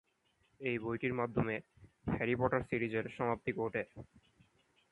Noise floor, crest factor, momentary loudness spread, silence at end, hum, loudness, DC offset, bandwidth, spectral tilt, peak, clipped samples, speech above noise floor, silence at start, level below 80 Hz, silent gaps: -76 dBFS; 20 dB; 9 LU; 0.9 s; none; -37 LUFS; under 0.1%; 10.5 kHz; -8.5 dB/octave; -18 dBFS; under 0.1%; 39 dB; 0.6 s; -60 dBFS; none